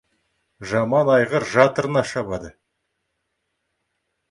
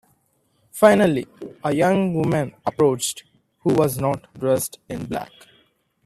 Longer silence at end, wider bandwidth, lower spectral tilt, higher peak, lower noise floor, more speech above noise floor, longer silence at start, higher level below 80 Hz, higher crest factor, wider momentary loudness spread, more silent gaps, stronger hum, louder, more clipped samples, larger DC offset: first, 1.8 s vs 0.8 s; second, 11.5 kHz vs 15.5 kHz; about the same, -6 dB/octave vs -5.5 dB/octave; about the same, 0 dBFS vs 0 dBFS; first, -75 dBFS vs -66 dBFS; first, 56 dB vs 45 dB; second, 0.6 s vs 0.75 s; about the same, -56 dBFS vs -56 dBFS; about the same, 22 dB vs 22 dB; about the same, 13 LU vs 15 LU; neither; neither; about the same, -19 LUFS vs -21 LUFS; neither; neither